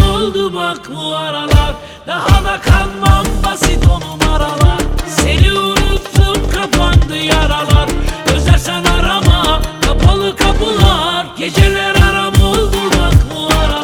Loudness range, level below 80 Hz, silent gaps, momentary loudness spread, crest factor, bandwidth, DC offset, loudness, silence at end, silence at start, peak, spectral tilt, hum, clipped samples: 2 LU; -16 dBFS; none; 7 LU; 12 dB; 19 kHz; under 0.1%; -12 LUFS; 0 s; 0 s; 0 dBFS; -5 dB/octave; none; 0.6%